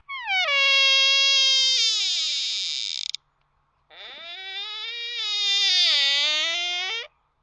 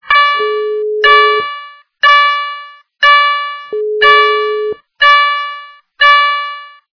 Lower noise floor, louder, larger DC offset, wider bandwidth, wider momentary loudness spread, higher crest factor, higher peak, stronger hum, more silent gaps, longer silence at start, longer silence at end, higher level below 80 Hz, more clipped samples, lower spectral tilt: first, -68 dBFS vs -31 dBFS; second, -19 LUFS vs -10 LUFS; neither; first, 11 kHz vs 5.4 kHz; about the same, 16 LU vs 15 LU; first, 18 dB vs 12 dB; second, -6 dBFS vs 0 dBFS; neither; neither; about the same, 0.1 s vs 0.05 s; about the same, 0.35 s vs 0.25 s; second, -74 dBFS vs -56 dBFS; second, under 0.1% vs 0.2%; second, 4.5 dB/octave vs -1 dB/octave